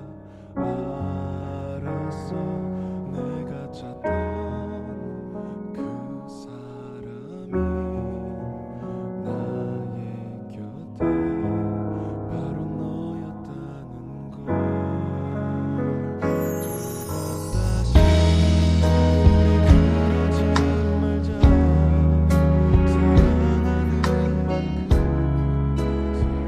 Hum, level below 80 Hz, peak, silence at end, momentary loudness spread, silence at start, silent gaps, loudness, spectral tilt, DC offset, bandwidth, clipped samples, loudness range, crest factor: none; -26 dBFS; -2 dBFS; 0 s; 18 LU; 0 s; none; -22 LUFS; -7.5 dB/octave; under 0.1%; 14 kHz; under 0.1%; 13 LU; 20 dB